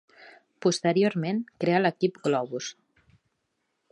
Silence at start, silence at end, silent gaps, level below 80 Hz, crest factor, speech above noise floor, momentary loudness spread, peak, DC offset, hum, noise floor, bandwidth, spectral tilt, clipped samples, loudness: 0.2 s; 1.2 s; none; -74 dBFS; 20 dB; 52 dB; 9 LU; -8 dBFS; under 0.1%; none; -78 dBFS; 11 kHz; -5.5 dB/octave; under 0.1%; -26 LUFS